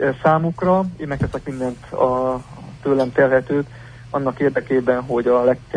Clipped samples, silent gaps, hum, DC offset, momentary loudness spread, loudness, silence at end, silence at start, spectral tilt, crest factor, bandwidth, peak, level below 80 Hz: under 0.1%; none; none; under 0.1%; 11 LU; -20 LUFS; 0 s; 0 s; -8.5 dB/octave; 16 dB; 10 kHz; -2 dBFS; -44 dBFS